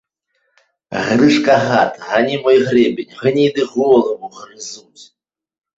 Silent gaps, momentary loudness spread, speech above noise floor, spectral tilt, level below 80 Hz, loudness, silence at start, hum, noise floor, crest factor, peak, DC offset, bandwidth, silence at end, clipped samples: none; 18 LU; 53 dB; -5.5 dB/octave; -56 dBFS; -14 LUFS; 0.9 s; none; -68 dBFS; 16 dB; 0 dBFS; under 0.1%; 8 kHz; 0.75 s; under 0.1%